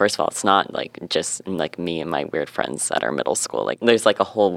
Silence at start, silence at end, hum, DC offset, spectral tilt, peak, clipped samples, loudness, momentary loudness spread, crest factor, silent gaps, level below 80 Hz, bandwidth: 0 s; 0 s; none; under 0.1%; -3 dB/octave; 0 dBFS; under 0.1%; -22 LUFS; 8 LU; 20 dB; none; -62 dBFS; 16 kHz